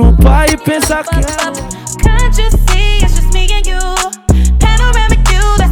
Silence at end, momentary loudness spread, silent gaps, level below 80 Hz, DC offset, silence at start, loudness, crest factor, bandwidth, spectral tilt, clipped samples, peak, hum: 0 s; 6 LU; none; -10 dBFS; under 0.1%; 0 s; -12 LUFS; 8 dB; 18 kHz; -4.5 dB/octave; under 0.1%; 0 dBFS; none